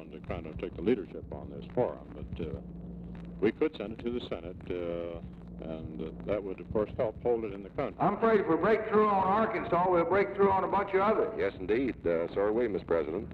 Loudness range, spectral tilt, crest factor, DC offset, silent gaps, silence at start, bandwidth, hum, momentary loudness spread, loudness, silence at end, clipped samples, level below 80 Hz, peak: 9 LU; -9 dB/octave; 16 dB; under 0.1%; none; 0 s; 5.2 kHz; none; 16 LU; -31 LUFS; 0 s; under 0.1%; -52 dBFS; -14 dBFS